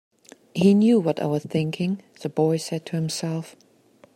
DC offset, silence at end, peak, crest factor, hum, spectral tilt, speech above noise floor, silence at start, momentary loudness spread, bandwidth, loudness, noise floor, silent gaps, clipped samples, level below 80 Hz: under 0.1%; 0.65 s; -6 dBFS; 16 dB; none; -6.5 dB/octave; 34 dB; 0.55 s; 13 LU; 15.5 kHz; -23 LUFS; -56 dBFS; none; under 0.1%; -68 dBFS